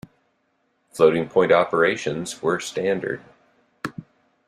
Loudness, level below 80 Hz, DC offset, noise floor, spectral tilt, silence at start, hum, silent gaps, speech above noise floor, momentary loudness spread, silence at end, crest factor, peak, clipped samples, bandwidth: -21 LUFS; -62 dBFS; under 0.1%; -69 dBFS; -5 dB/octave; 0.95 s; none; none; 48 dB; 17 LU; 0.45 s; 20 dB; -2 dBFS; under 0.1%; 13.5 kHz